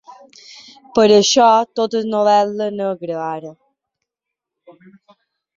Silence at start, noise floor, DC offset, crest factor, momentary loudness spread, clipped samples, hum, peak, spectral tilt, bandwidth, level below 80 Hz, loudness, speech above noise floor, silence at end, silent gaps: 0.1 s; -83 dBFS; under 0.1%; 16 dB; 14 LU; under 0.1%; none; -2 dBFS; -3.5 dB/octave; 7.6 kHz; -62 dBFS; -15 LUFS; 67 dB; 2.05 s; none